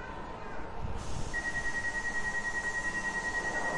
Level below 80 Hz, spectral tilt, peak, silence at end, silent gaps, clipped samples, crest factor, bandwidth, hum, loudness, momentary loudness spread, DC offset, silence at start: -46 dBFS; -3.5 dB/octave; -22 dBFS; 0 s; none; under 0.1%; 12 dB; 11.5 kHz; none; -34 LUFS; 10 LU; under 0.1%; 0 s